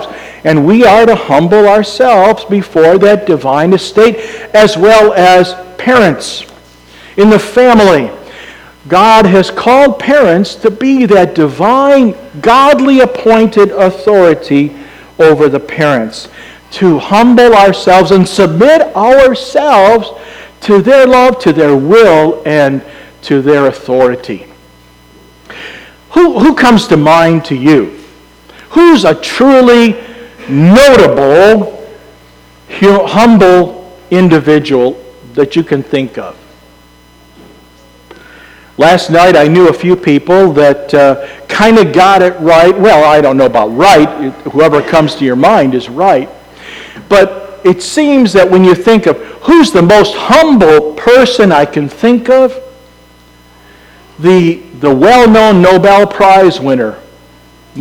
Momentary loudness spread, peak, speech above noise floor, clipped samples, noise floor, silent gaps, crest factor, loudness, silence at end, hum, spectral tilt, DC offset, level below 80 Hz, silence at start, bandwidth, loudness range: 10 LU; 0 dBFS; 35 dB; 5%; -40 dBFS; none; 6 dB; -6 LUFS; 0 s; 60 Hz at -40 dBFS; -6 dB/octave; under 0.1%; -38 dBFS; 0 s; 19 kHz; 5 LU